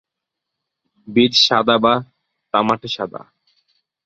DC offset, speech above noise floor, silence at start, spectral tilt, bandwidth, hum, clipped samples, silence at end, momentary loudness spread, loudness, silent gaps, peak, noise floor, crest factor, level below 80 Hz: under 0.1%; 65 dB; 1.1 s; -4 dB/octave; 7.8 kHz; none; under 0.1%; 0.85 s; 13 LU; -16 LUFS; none; -2 dBFS; -82 dBFS; 18 dB; -58 dBFS